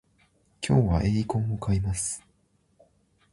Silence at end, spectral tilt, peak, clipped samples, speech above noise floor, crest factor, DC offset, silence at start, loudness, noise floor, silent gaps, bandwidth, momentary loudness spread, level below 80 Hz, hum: 1.15 s; -6 dB/octave; -8 dBFS; under 0.1%; 43 dB; 20 dB; under 0.1%; 0.6 s; -27 LUFS; -67 dBFS; none; 11.5 kHz; 10 LU; -40 dBFS; none